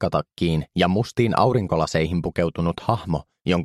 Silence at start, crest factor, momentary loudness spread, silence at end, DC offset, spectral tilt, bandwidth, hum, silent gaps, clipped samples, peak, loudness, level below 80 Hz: 0 s; 20 dB; 5 LU; 0 s; under 0.1%; -6.5 dB/octave; 12.5 kHz; none; none; under 0.1%; -2 dBFS; -22 LUFS; -42 dBFS